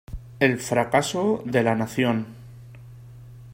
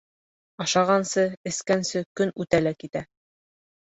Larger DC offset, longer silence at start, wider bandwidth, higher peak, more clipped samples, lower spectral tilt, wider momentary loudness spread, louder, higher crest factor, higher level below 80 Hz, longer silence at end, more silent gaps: neither; second, 0.1 s vs 0.6 s; first, 16 kHz vs 8.2 kHz; about the same, -4 dBFS vs -6 dBFS; neither; first, -5.5 dB/octave vs -4 dB/octave; first, 23 LU vs 11 LU; about the same, -23 LUFS vs -25 LUFS; about the same, 20 dB vs 20 dB; first, -48 dBFS vs -60 dBFS; second, 0 s vs 0.9 s; second, none vs 1.37-1.44 s, 2.06-2.15 s